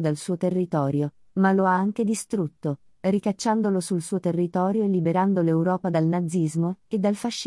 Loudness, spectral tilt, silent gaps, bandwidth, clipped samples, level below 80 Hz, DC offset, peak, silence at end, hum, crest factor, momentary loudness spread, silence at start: -24 LUFS; -6.5 dB/octave; none; 12 kHz; under 0.1%; -68 dBFS; under 0.1%; -8 dBFS; 0 s; none; 16 dB; 6 LU; 0 s